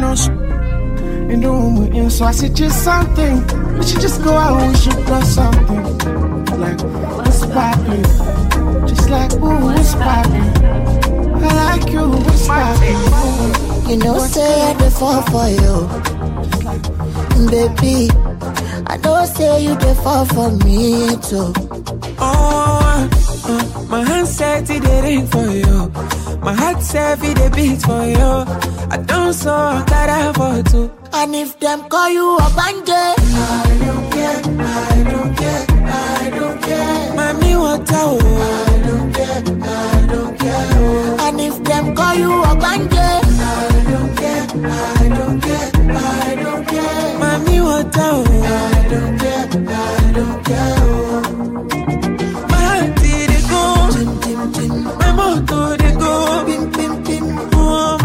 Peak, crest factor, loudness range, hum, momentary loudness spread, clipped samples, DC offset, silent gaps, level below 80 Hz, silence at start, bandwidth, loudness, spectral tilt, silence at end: 0 dBFS; 12 dB; 2 LU; none; 6 LU; under 0.1%; under 0.1%; none; -16 dBFS; 0 s; 16.5 kHz; -15 LUFS; -5.5 dB/octave; 0 s